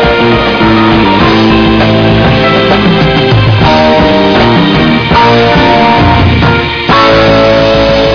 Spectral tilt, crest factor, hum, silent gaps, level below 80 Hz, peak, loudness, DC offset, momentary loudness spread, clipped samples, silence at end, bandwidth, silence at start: -7 dB/octave; 6 dB; none; none; -22 dBFS; 0 dBFS; -6 LUFS; under 0.1%; 2 LU; 0.8%; 0 s; 5.4 kHz; 0 s